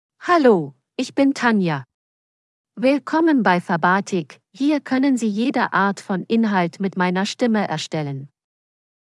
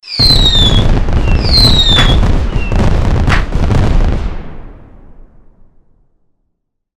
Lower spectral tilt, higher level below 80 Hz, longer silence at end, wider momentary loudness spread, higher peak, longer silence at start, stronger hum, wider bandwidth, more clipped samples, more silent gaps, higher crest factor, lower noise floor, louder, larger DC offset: about the same, -6 dB/octave vs -5 dB/octave; second, -84 dBFS vs -14 dBFS; second, 0.9 s vs 2.25 s; about the same, 10 LU vs 11 LU; second, -4 dBFS vs 0 dBFS; first, 0.2 s vs 0.05 s; neither; second, 12 kHz vs 13.5 kHz; second, under 0.1% vs 0.3%; first, 1.94-2.64 s vs none; first, 16 dB vs 10 dB; first, under -90 dBFS vs -67 dBFS; second, -20 LUFS vs -10 LUFS; neither